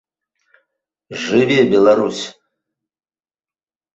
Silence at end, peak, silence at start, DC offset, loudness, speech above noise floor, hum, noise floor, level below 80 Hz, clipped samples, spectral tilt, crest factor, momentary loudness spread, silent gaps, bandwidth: 1.65 s; -2 dBFS; 1.1 s; under 0.1%; -14 LUFS; over 76 dB; none; under -90 dBFS; -58 dBFS; under 0.1%; -5 dB/octave; 18 dB; 17 LU; none; 8 kHz